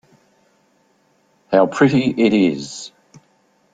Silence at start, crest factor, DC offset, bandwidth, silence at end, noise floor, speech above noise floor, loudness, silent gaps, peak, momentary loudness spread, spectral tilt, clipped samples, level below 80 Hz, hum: 1.5 s; 18 dB; under 0.1%; 9.2 kHz; 0.85 s; -60 dBFS; 44 dB; -16 LUFS; none; -2 dBFS; 17 LU; -6 dB/octave; under 0.1%; -60 dBFS; none